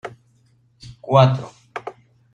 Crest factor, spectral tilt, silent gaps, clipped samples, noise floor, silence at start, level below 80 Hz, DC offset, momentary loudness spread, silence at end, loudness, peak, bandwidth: 20 dB; -7.5 dB/octave; none; under 0.1%; -59 dBFS; 0.05 s; -58 dBFS; under 0.1%; 23 LU; 0.45 s; -17 LUFS; -2 dBFS; 7.2 kHz